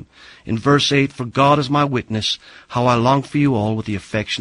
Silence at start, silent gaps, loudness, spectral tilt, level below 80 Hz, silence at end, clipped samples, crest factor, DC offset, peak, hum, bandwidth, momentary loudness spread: 0 s; none; -18 LUFS; -5.5 dB/octave; -48 dBFS; 0 s; under 0.1%; 16 dB; under 0.1%; -2 dBFS; none; 11 kHz; 10 LU